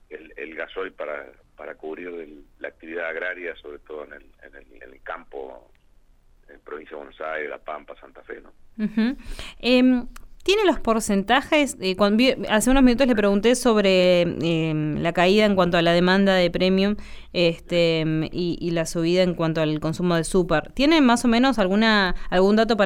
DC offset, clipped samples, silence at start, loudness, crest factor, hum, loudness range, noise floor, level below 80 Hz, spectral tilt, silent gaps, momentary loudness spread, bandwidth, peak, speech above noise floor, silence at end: under 0.1%; under 0.1%; 0.1 s; -21 LUFS; 16 dB; none; 17 LU; -55 dBFS; -40 dBFS; -5 dB/octave; none; 20 LU; 16 kHz; -6 dBFS; 33 dB; 0 s